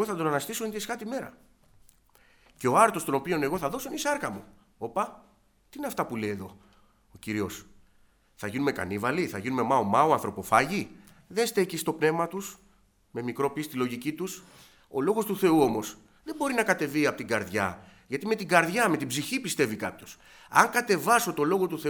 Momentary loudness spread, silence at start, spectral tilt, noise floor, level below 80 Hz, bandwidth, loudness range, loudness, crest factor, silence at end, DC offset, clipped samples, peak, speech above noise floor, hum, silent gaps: 16 LU; 0 s; -4.5 dB/octave; -63 dBFS; -64 dBFS; over 20 kHz; 8 LU; -28 LUFS; 26 dB; 0 s; under 0.1%; under 0.1%; -2 dBFS; 35 dB; none; none